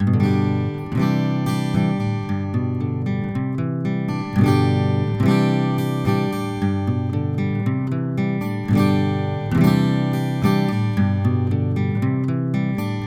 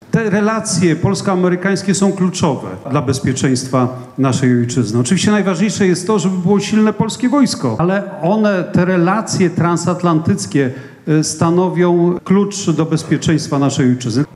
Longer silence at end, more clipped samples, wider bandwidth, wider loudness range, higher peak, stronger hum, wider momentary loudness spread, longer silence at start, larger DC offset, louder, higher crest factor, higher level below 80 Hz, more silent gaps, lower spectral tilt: about the same, 0 s vs 0.1 s; neither; first, 15 kHz vs 12.5 kHz; about the same, 3 LU vs 1 LU; about the same, -2 dBFS vs 0 dBFS; neither; about the same, 6 LU vs 4 LU; about the same, 0 s vs 0.1 s; neither; second, -21 LUFS vs -15 LUFS; about the same, 16 dB vs 14 dB; about the same, -46 dBFS vs -50 dBFS; neither; first, -8 dB/octave vs -5.5 dB/octave